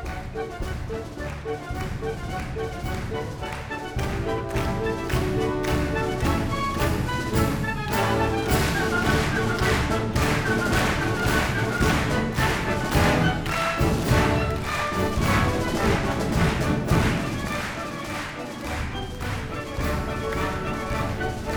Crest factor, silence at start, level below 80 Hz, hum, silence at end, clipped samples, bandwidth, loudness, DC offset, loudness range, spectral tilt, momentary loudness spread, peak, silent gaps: 18 dB; 0 s; -34 dBFS; none; 0 s; under 0.1%; over 20 kHz; -25 LUFS; under 0.1%; 7 LU; -5.5 dB/octave; 10 LU; -8 dBFS; none